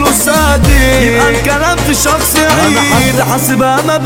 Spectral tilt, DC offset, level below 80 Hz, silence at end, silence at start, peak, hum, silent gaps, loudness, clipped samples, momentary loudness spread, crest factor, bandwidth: -4 dB/octave; under 0.1%; -18 dBFS; 0 s; 0 s; 0 dBFS; none; none; -9 LUFS; under 0.1%; 3 LU; 8 dB; 17 kHz